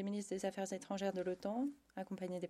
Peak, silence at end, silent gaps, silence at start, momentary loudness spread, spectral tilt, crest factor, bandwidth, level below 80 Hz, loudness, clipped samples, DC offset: -26 dBFS; 0 s; none; 0 s; 5 LU; -5.5 dB/octave; 16 dB; 13.5 kHz; -78 dBFS; -42 LUFS; under 0.1%; under 0.1%